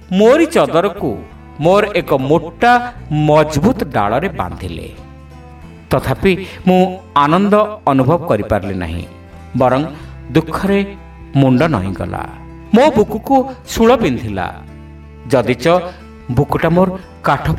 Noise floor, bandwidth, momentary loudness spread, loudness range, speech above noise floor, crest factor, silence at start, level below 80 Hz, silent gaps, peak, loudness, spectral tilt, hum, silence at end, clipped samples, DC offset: -35 dBFS; 16 kHz; 14 LU; 3 LU; 22 dB; 14 dB; 0 s; -36 dBFS; none; 0 dBFS; -14 LUFS; -7 dB/octave; none; 0 s; under 0.1%; under 0.1%